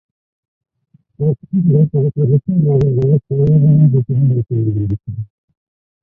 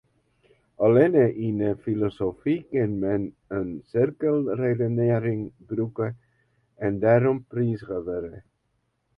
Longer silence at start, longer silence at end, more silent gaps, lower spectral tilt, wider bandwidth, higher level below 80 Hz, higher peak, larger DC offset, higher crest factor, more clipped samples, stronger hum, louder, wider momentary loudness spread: first, 1.2 s vs 0.8 s; about the same, 0.75 s vs 0.8 s; neither; first, -13.5 dB/octave vs -11 dB/octave; second, 1.4 kHz vs 5 kHz; first, -42 dBFS vs -56 dBFS; first, -2 dBFS vs -6 dBFS; neither; second, 12 dB vs 20 dB; neither; neither; first, -14 LUFS vs -25 LUFS; about the same, 10 LU vs 12 LU